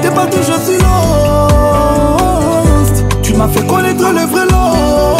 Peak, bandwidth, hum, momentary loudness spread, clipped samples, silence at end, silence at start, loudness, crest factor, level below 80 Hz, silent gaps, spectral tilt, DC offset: 0 dBFS; 16.5 kHz; none; 2 LU; under 0.1%; 0 s; 0 s; -10 LUFS; 10 dB; -18 dBFS; none; -5.5 dB/octave; under 0.1%